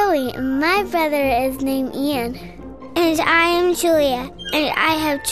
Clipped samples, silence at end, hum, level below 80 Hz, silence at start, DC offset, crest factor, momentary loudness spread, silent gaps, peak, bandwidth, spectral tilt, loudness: under 0.1%; 0 s; none; -44 dBFS; 0 s; 0.5%; 16 dB; 11 LU; none; -2 dBFS; 14 kHz; -3.5 dB/octave; -18 LUFS